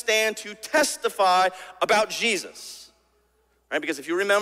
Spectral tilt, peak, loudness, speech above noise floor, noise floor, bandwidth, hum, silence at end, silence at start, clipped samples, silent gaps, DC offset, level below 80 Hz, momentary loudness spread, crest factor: -1.5 dB/octave; -8 dBFS; -23 LUFS; 43 dB; -66 dBFS; 16 kHz; none; 0 s; 0.05 s; under 0.1%; none; under 0.1%; -70 dBFS; 16 LU; 18 dB